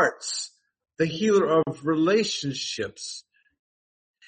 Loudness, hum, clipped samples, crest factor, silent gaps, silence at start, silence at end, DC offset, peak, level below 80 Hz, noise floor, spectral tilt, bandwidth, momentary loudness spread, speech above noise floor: -25 LUFS; none; under 0.1%; 18 dB; none; 0 s; 1.05 s; under 0.1%; -8 dBFS; -68 dBFS; under -90 dBFS; -4 dB/octave; 8.8 kHz; 15 LU; over 66 dB